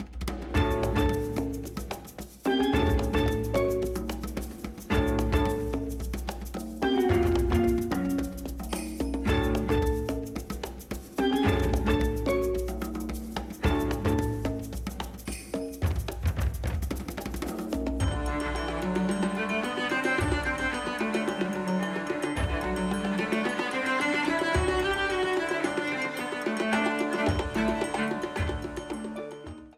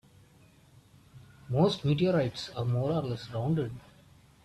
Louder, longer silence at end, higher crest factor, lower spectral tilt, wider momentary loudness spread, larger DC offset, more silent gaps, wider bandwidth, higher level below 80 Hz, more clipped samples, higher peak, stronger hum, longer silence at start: about the same, -29 LUFS vs -30 LUFS; second, 0.05 s vs 0.65 s; about the same, 16 dB vs 18 dB; second, -6 dB/octave vs -7.5 dB/octave; about the same, 10 LU vs 9 LU; neither; neither; first, 16 kHz vs 12 kHz; first, -36 dBFS vs -60 dBFS; neither; about the same, -12 dBFS vs -14 dBFS; neither; second, 0 s vs 1.15 s